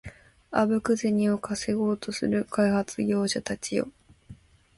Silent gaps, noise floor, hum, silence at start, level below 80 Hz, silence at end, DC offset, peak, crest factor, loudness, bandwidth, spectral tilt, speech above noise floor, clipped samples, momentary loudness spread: none; -51 dBFS; none; 0.05 s; -58 dBFS; 0.45 s; under 0.1%; -10 dBFS; 18 dB; -27 LUFS; 11.5 kHz; -5 dB/octave; 25 dB; under 0.1%; 6 LU